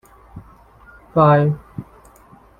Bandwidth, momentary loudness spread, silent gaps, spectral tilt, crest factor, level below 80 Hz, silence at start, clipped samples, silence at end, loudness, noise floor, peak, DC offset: 4.7 kHz; 23 LU; none; -9.5 dB/octave; 18 dB; -50 dBFS; 0.35 s; under 0.1%; 0.75 s; -16 LUFS; -48 dBFS; -2 dBFS; under 0.1%